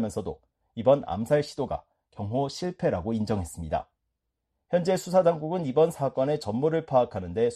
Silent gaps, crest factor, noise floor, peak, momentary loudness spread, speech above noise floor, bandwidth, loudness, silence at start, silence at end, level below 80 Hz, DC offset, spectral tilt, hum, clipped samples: none; 18 dB; -81 dBFS; -8 dBFS; 10 LU; 55 dB; 13 kHz; -27 LUFS; 0 s; 0 s; -52 dBFS; under 0.1%; -6.5 dB/octave; none; under 0.1%